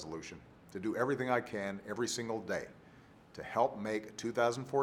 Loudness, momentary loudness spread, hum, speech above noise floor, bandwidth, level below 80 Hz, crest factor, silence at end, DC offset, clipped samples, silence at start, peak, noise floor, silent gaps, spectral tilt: -36 LUFS; 16 LU; none; 23 dB; 17.5 kHz; -70 dBFS; 20 dB; 0 s; under 0.1%; under 0.1%; 0 s; -16 dBFS; -59 dBFS; none; -4.5 dB/octave